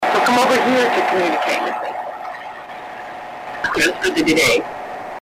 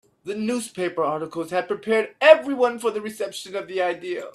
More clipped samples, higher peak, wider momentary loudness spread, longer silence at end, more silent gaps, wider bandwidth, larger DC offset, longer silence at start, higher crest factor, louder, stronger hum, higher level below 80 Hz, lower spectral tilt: neither; second, -4 dBFS vs 0 dBFS; about the same, 17 LU vs 15 LU; about the same, 0 s vs 0.05 s; neither; first, 16 kHz vs 13.5 kHz; neither; second, 0 s vs 0.25 s; second, 14 dB vs 22 dB; first, -17 LUFS vs -22 LUFS; neither; first, -52 dBFS vs -72 dBFS; about the same, -3 dB/octave vs -4 dB/octave